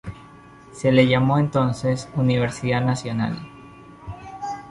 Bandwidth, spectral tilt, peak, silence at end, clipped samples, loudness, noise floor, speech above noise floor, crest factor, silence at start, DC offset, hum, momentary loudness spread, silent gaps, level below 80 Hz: 11.5 kHz; -7 dB/octave; -4 dBFS; 0 s; under 0.1%; -21 LUFS; -45 dBFS; 25 dB; 18 dB; 0.05 s; under 0.1%; none; 21 LU; none; -50 dBFS